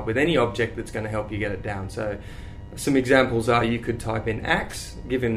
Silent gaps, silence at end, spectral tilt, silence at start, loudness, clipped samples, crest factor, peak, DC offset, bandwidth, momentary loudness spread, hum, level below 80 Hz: none; 0 s; -5.5 dB/octave; 0 s; -24 LUFS; under 0.1%; 20 dB; -4 dBFS; under 0.1%; 15.5 kHz; 14 LU; none; -40 dBFS